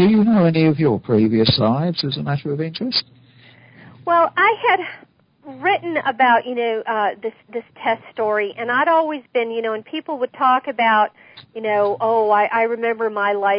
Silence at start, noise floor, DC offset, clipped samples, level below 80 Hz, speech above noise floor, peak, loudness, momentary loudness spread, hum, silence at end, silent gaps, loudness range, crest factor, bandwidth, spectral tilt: 0 s; -48 dBFS; under 0.1%; under 0.1%; -54 dBFS; 30 dB; -4 dBFS; -18 LUFS; 9 LU; none; 0 s; none; 3 LU; 14 dB; 5.4 kHz; -10.5 dB/octave